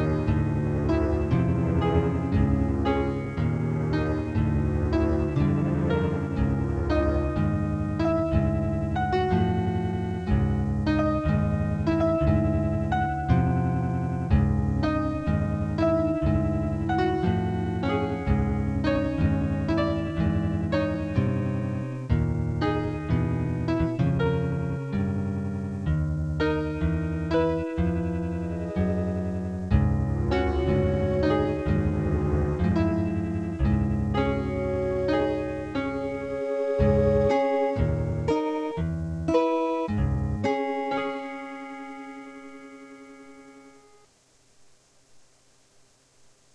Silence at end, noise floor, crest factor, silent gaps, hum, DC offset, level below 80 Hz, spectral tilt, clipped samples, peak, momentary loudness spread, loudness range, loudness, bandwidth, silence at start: 1.35 s; -61 dBFS; 16 dB; none; none; under 0.1%; -34 dBFS; -9 dB/octave; under 0.1%; -8 dBFS; 6 LU; 3 LU; -26 LUFS; 9.4 kHz; 0 s